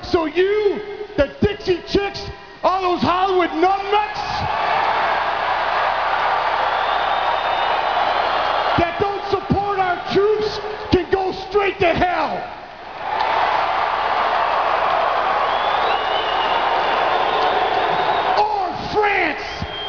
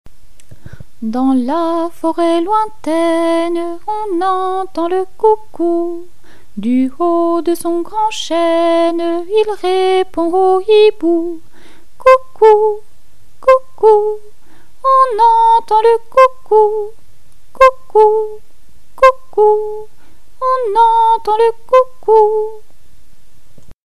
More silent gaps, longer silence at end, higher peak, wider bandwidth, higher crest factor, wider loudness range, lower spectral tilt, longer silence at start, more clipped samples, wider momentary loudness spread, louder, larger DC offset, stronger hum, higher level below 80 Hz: second, none vs 23.74-23.82 s; about the same, 0 s vs 0 s; about the same, 0 dBFS vs 0 dBFS; second, 5.4 kHz vs 13 kHz; about the same, 18 dB vs 14 dB; second, 2 LU vs 5 LU; about the same, -5.5 dB/octave vs -4.5 dB/octave; about the same, 0 s vs 0.05 s; second, under 0.1% vs 0.2%; second, 5 LU vs 11 LU; second, -19 LUFS vs -13 LUFS; second, 0.2% vs 6%; neither; about the same, -42 dBFS vs -46 dBFS